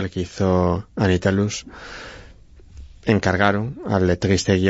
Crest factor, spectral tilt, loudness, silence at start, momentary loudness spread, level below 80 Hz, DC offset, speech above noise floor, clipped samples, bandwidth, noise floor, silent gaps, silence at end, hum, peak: 18 dB; -6 dB/octave; -20 LUFS; 0 s; 17 LU; -42 dBFS; under 0.1%; 25 dB; under 0.1%; 8 kHz; -45 dBFS; none; 0 s; none; -2 dBFS